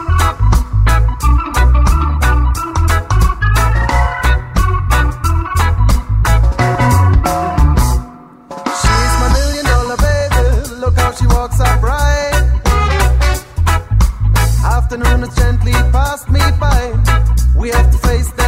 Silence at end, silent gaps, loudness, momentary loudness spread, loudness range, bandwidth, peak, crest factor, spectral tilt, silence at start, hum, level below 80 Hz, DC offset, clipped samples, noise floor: 0 s; none; -13 LUFS; 3 LU; 1 LU; 16 kHz; 0 dBFS; 10 dB; -5.5 dB/octave; 0 s; none; -14 dBFS; under 0.1%; under 0.1%; -33 dBFS